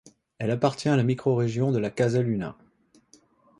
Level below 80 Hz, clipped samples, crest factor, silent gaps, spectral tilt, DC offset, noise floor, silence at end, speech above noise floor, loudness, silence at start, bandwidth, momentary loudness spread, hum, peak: -60 dBFS; under 0.1%; 18 dB; none; -7.5 dB/octave; under 0.1%; -62 dBFS; 1.05 s; 37 dB; -25 LUFS; 0.4 s; 11 kHz; 7 LU; none; -8 dBFS